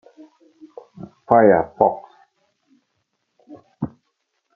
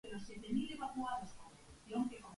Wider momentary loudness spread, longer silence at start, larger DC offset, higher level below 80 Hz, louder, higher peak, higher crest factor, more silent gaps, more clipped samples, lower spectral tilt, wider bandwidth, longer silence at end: first, 27 LU vs 18 LU; first, 1 s vs 0.05 s; neither; first, -58 dBFS vs -66 dBFS; first, -18 LUFS vs -43 LUFS; first, 0 dBFS vs -26 dBFS; about the same, 22 dB vs 18 dB; neither; neither; first, -10.5 dB/octave vs -5 dB/octave; second, 3.8 kHz vs 11.5 kHz; first, 0.7 s vs 0 s